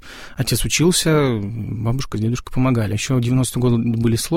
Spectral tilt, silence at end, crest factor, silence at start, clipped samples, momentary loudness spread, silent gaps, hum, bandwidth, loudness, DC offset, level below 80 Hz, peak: -5 dB/octave; 0 s; 14 dB; 0.05 s; under 0.1%; 9 LU; none; none; 16.5 kHz; -19 LUFS; 0.3%; -36 dBFS; -4 dBFS